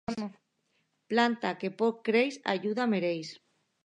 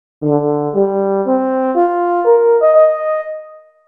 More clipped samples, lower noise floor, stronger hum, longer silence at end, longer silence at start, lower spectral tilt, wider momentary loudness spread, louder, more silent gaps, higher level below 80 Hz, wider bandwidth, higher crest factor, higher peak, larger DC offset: neither; first, -76 dBFS vs -36 dBFS; neither; first, 0.5 s vs 0.3 s; about the same, 0.1 s vs 0.2 s; second, -5.5 dB/octave vs -11 dB/octave; about the same, 11 LU vs 9 LU; second, -30 LUFS vs -14 LUFS; neither; second, -72 dBFS vs -64 dBFS; first, 9.8 kHz vs 3.3 kHz; first, 20 dB vs 12 dB; second, -12 dBFS vs 0 dBFS; neither